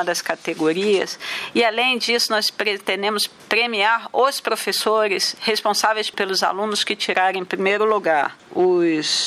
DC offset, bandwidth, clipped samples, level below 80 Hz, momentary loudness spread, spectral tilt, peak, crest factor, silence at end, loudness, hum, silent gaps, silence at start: under 0.1%; 15.5 kHz; under 0.1%; -72 dBFS; 5 LU; -2 dB/octave; -2 dBFS; 18 dB; 0 s; -19 LUFS; none; none; 0 s